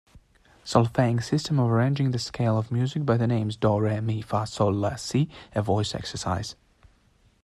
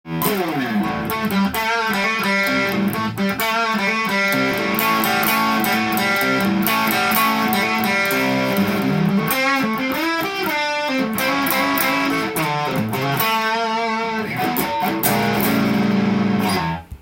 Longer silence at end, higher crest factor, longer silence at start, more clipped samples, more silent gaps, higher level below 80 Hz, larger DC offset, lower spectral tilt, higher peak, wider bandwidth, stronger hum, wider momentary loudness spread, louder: first, 0.9 s vs 0.05 s; about the same, 20 dB vs 20 dB; about the same, 0.15 s vs 0.05 s; neither; neither; about the same, -54 dBFS vs -52 dBFS; neither; first, -6.5 dB/octave vs -4.5 dB/octave; second, -6 dBFS vs 0 dBFS; second, 12 kHz vs 17 kHz; neither; first, 7 LU vs 4 LU; second, -26 LUFS vs -18 LUFS